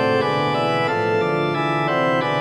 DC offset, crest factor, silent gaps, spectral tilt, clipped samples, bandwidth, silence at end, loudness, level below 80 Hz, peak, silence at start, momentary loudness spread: 0.2%; 12 dB; none; -6.5 dB/octave; under 0.1%; 12.5 kHz; 0 s; -20 LUFS; -66 dBFS; -8 dBFS; 0 s; 2 LU